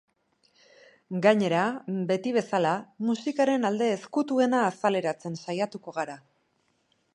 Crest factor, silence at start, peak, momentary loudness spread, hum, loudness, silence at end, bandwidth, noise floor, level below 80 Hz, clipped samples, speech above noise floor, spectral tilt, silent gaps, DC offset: 22 dB; 1.1 s; -6 dBFS; 11 LU; none; -27 LUFS; 0.95 s; 11 kHz; -71 dBFS; -78 dBFS; under 0.1%; 45 dB; -6 dB/octave; none; under 0.1%